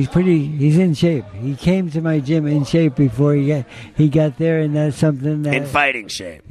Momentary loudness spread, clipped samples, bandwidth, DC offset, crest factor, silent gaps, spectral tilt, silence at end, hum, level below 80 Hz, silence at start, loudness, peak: 8 LU; under 0.1%; 12 kHz; under 0.1%; 14 dB; none; -7.5 dB/octave; 0.15 s; none; -44 dBFS; 0 s; -17 LUFS; -2 dBFS